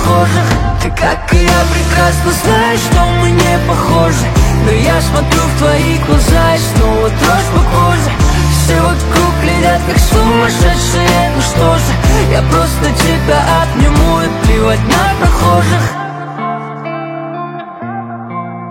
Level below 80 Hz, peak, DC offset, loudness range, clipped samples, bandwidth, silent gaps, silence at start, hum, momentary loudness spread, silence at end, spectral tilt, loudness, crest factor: -16 dBFS; 0 dBFS; under 0.1%; 2 LU; under 0.1%; 17 kHz; none; 0 s; none; 11 LU; 0 s; -5 dB/octave; -11 LUFS; 10 dB